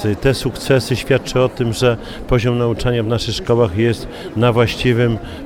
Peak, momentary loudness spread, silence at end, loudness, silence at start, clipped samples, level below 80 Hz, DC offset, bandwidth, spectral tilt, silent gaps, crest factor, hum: -2 dBFS; 4 LU; 0 s; -17 LUFS; 0 s; under 0.1%; -32 dBFS; under 0.1%; 16 kHz; -6 dB/octave; none; 14 dB; none